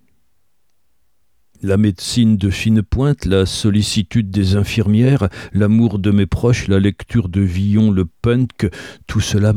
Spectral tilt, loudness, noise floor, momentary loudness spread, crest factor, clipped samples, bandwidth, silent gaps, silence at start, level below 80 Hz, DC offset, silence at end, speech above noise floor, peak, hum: -6.5 dB/octave; -16 LUFS; -69 dBFS; 6 LU; 14 dB; under 0.1%; 14 kHz; none; 1.65 s; -34 dBFS; 0.2%; 0 s; 55 dB; 0 dBFS; none